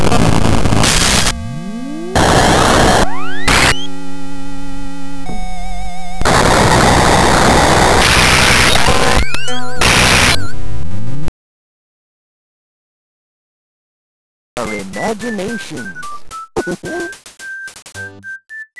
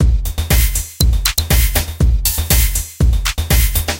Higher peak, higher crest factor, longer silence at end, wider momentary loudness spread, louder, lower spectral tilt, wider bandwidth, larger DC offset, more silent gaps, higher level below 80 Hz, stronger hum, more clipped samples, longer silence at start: about the same, -2 dBFS vs 0 dBFS; about the same, 10 dB vs 14 dB; about the same, 0 s vs 0 s; first, 20 LU vs 4 LU; first, -11 LUFS vs -15 LUFS; about the same, -3.5 dB/octave vs -3.5 dB/octave; second, 11 kHz vs 17.5 kHz; neither; first, 11.28-14.56 s vs none; second, -24 dBFS vs -16 dBFS; neither; neither; about the same, 0 s vs 0 s